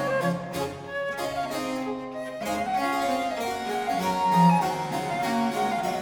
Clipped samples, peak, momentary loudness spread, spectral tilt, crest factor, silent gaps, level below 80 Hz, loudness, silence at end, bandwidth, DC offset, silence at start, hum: under 0.1%; -8 dBFS; 11 LU; -5.5 dB/octave; 18 dB; none; -58 dBFS; -27 LUFS; 0 s; 19.5 kHz; under 0.1%; 0 s; none